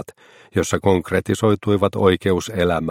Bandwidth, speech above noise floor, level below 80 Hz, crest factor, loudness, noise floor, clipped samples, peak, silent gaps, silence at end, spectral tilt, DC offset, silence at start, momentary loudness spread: 16 kHz; 23 dB; -46 dBFS; 18 dB; -19 LUFS; -42 dBFS; under 0.1%; -2 dBFS; none; 0 s; -6 dB/octave; under 0.1%; 0 s; 6 LU